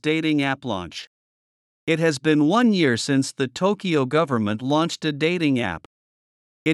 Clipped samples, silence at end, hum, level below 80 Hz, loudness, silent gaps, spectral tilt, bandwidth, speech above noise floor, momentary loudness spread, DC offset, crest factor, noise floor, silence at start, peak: under 0.1%; 0 s; none; -64 dBFS; -21 LUFS; 1.07-1.87 s, 5.86-6.66 s; -5.5 dB/octave; 12 kHz; over 69 dB; 11 LU; under 0.1%; 16 dB; under -90 dBFS; 0.05 s; -6 dBFS